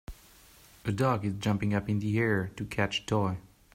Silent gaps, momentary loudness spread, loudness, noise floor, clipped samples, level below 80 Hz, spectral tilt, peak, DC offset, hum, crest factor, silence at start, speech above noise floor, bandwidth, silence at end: none; 8 LU; -30 LUFS; -56 dBFS; under 0.1%; -54 dBFS; -6.5 dB/octave; -14 dBFS; under 0.1%; none; 18 dB; 0.1 s; 27 dB; 16 kHz; 0.3 s